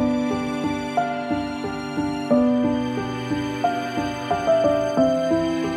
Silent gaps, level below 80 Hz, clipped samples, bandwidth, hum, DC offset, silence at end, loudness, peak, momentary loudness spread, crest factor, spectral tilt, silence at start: none; -48 dBFS; under 0.1%; 13.5 kHz; none; under 0.1%; 0 s; -23 LUFS; -6 dBFS; 7 LU; 16 dB; -6 dB/octave; 0 s